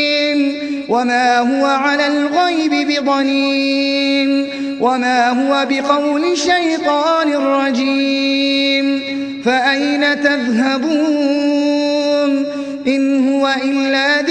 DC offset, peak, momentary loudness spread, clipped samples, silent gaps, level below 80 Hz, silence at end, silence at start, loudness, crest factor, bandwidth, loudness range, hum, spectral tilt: under 0.1%; 0 dBFS; 3 LU; under 0.1%; none; -60 dBFS; 0 s; 0 s; -15 LUFS; 14 dB; 9.4 kHz; 1 LU; none; -3 dB/octave